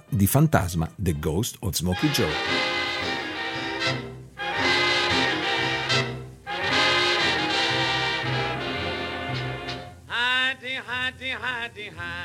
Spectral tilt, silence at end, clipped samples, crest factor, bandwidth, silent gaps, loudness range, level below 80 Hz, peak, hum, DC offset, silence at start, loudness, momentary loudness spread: -4 dB/octave; 0 s; under 0.1%; 22 dB; 16 kHz; none; 5 LU; -46 dBFS; -4 dBFS; none; under 0.1%; 0.1 s; -24 LUFS; 11 LU